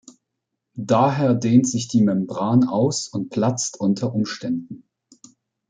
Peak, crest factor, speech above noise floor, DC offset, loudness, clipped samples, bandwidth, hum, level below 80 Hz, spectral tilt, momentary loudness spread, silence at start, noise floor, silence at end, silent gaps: -4 dBFS; 18 dB; 60 dB; under 0.1%; -20 LUFS; under 0.1%; 9.4 kHz; none; -62 dBFS; -6 dB/octave; 11 LU; 0.75 s; -80 dBFS; 0.9 s; none